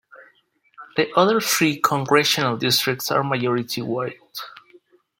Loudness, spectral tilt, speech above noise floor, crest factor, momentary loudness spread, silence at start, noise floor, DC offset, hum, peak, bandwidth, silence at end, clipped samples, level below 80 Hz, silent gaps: -20 LUFS; -3.5 dB/octave; 40 dB; 20 dB; 13 LU; 0.15 s; -61 dBFS; under 0.1%; none; -2 dBFS; 17 kHz; 0.7 s; under 0.1%; -66 dBFS; none